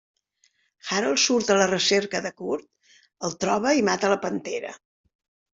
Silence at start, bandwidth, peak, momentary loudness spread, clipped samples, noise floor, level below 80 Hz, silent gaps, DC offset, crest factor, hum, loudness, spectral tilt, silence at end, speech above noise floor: 0.85 s; 8 kHz; -6 dBFS; 13 LU; under 0.1%; -67 dBFS; -66 dBFS; none; under 0.1%; 20 dB; none; -23 LUFS; -3 dB/octave; 0.75 s; 44 dB